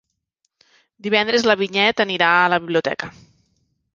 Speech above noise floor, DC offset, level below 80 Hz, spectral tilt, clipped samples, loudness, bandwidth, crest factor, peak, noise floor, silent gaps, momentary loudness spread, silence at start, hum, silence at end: 55 dB; under 0.1%; -62 dBFS; -4 dB/octave; under 0.1%; -18 LUFS; 7.4 kHz; 20 dB; -2 dBFS; -73 dBFS; none; 13 LU; 1.05 s; none; 0.85 s